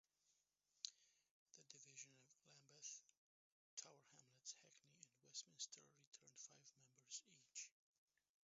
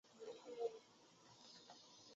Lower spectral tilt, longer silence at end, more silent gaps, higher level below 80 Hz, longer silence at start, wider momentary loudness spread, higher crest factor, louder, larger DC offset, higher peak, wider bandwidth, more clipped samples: second, -0.5 dB/octave vs -2 dB/octave; first, 0.75 s vs 0 s; first, 1.31-1.46 s, 3.17-3.77 s, 6.07-6.12 s vs none; about the same, under -90 dBFS vs under -90 dBFS; first, 0.25 s vs 0.05 s; second, 12 LU vs 18 LU; first, 36 dB vs 22 dB; second, -59 LUFS vs -54 LUFS; neither; first, -28 dBFS vs -34 dBFS; about the same, 7.6 kHz vs 7.6 kHz; neither